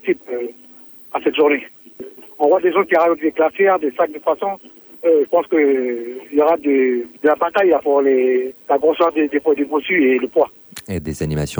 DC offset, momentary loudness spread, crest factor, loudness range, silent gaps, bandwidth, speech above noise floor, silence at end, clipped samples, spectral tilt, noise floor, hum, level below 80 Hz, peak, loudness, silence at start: under 0.1%; 12 LU; 14 dB; 2 LU; none; over 20 kHz; 25 dB; 0 s; under 0.1%; -6.5 dB/octave; -42 dBFS; none; -48 dBFS; -4 dBFS; -17 LUFS; 0.05 s